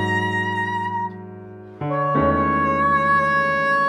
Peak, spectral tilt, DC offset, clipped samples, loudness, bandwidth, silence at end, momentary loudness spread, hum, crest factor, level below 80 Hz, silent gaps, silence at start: -8 dBFS; -6.5 dB/octave; under 0.1%; under 0.1%; -20 LUFS; 11 kHz; 0 s; 17 LU; none; 12 dB; -44 dBFS; none; 0 s